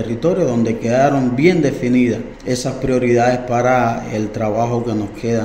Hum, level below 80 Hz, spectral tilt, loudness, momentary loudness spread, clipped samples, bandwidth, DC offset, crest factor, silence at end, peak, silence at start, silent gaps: none; -40 dBFS; -6.5 dB/octave; -17 LUFS; 8 LU; under 0.1%; 15.5 kHz; under 0.1%; 16 dB; 0 s; 0 dBFS; 0 s; none